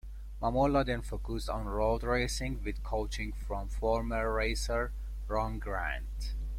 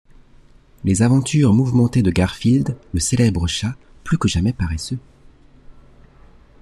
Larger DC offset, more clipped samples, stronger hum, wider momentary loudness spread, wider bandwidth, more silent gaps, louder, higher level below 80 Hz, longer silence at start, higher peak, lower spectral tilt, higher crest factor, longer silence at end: neither; neither; neither; about the same, 9 LU vs 11 LU; first, 14.5 kHz vs 13 kHz; neither; second, -34 LUFS vs -18 LUFS; about the same, -38 dBFS vs -36 dBFS; second, 0.05 s vs 0.85 s; second, -16 dBFS vs -2 dBFS; about the same, -5.5 dB/octave vs -6 dB/octave; about the same, 16 dB vs 16 dB; second, 0 s vs 0.9 s